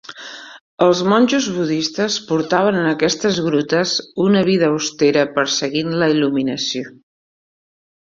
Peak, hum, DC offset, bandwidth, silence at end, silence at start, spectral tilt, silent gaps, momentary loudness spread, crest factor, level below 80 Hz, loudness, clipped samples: -2 dBFS; none; under 0.1%; 7.8 kHz; 1.1 s; 0.1 s; -4.5 dB/octave; 0.61-0.78 s; 7 LU; 16 dB; -60 dBFS; -17 LUFS; under 0.1%